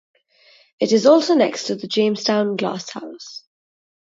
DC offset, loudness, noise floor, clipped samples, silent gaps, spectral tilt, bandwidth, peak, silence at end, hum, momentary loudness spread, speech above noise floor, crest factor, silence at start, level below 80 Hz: under 0.1%; -18 LUFS; -54 dBFS; under 0.1%; none; -4.5 dB/octave; 7.8 kHz; -2 dBFS; 0.75 s; none; 20 LU; 36 dB; 18 dB; 0.8 s; -72 dBFS